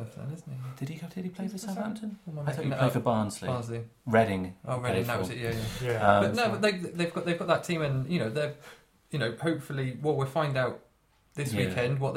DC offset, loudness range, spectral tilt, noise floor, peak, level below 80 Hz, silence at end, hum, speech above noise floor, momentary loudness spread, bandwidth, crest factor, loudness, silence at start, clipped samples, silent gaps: under 0.1%; 4 LU; -6 dB/octave; -66 dBFS; -6 dBFS; -58 dBFS; 0 s; none; 36 dB; 13 LU; 16.5 kHz; 24 dB; -30 LUFS; 0 s; under 0.1%; none